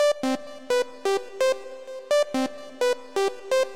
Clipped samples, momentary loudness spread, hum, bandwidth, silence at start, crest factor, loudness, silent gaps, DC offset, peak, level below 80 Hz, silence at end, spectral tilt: under 0.1%; 8 LU; none; 16 kHz; 0 s; 10 dB; -26 LUFS; none; 0.6%; -14 dBFS; -70 dBFS; 0 s; -2 dB/octave